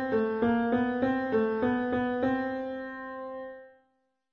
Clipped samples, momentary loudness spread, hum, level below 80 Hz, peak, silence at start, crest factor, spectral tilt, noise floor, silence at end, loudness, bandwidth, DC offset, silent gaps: under 0.1%; 12 LU; none; -60 dBFS; -16 dBFS; 0 s; 14 dB; -8.5 dB/octave; -74 dBFS; 0.65 s; -29 LUFS; 5.6 kHz; under 0.1%; none